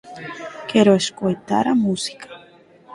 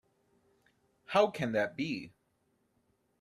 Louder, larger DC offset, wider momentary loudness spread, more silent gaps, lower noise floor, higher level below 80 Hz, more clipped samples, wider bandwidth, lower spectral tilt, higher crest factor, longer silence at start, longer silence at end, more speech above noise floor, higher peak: first, -19 LUFS vs -32 LUFS; neither; first, 19 LU vs 12 LU; neither; second, -49 dBFS vs -76 dBFS; first, -60 dBFS vs -74 dBFS; neither; second, 11.5 kHz vs 13.5 kHz; about the same, -5 dB/octave vs -5.5 dB/octave; about the same, 18 dB vs 22 dB; second, 0.05 s vs 1.1 s; second, 0 s vs 1.15 s; second, 31 dB vs 45 dB; first, -2 dBFS vs -14 dBFS